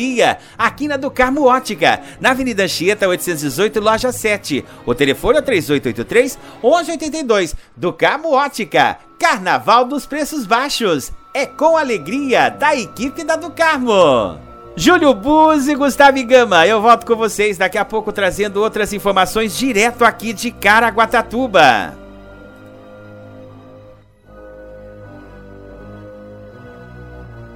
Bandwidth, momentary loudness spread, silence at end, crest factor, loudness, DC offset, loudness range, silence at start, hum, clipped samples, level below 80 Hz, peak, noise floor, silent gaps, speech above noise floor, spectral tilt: 18.5 kHz; 11 LU; 0 s; 16 dB; -15 LUFS; under 0.1%; 4 LU; 0 s; none; under 0.1%; -42 dBFS; 0 dBFS; -43 dBFS; none; 29 dB; -3.5 dB/octave